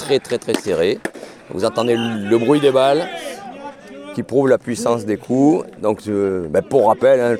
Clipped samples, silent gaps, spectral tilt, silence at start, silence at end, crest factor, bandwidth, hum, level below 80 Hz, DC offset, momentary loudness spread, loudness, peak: under 0.1%; none; -5.5 dB/octave; 0 s; 0 s; 16 dB; 15 kHz; none; -56 dBFS; under 0.1%; 16 LU; -17 LUFS; -2 dBFS